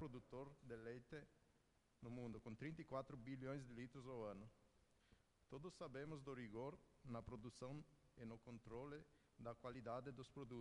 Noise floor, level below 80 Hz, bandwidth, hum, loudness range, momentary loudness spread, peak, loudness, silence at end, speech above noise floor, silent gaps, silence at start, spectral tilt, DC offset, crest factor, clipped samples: -81 dBFS; -74 dBFS; 11 kHz; none; 2 LU; 8 LU; -36 dBFS; -56 LUFS; 0 s; 25 dB; none; 0 s; -7 dB/octave; under 0.1%; 20 dB; under 0.1%